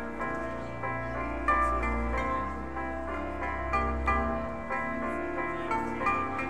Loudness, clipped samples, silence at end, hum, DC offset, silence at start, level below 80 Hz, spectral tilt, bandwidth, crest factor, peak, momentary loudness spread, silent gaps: -31 LUFS; under 0.1%; 0 s; none; 0.6%; 0 s; -40 dBFS; -7 dB/octave; 10.5 kHz; 18 dB; -14 dBFS; 7 LU; none